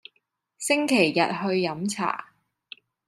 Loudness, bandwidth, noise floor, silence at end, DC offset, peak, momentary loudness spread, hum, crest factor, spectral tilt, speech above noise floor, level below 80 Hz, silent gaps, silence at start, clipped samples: -24 LUFS; 14.5 kHz; -73 dBFS; 0.85 s; under 0.1%; -6 dBFS; 10 LU; none; 22 dB; -4 dB/octave; 49 dB; -74 dBFS; none; 0.6 s; under 0.1%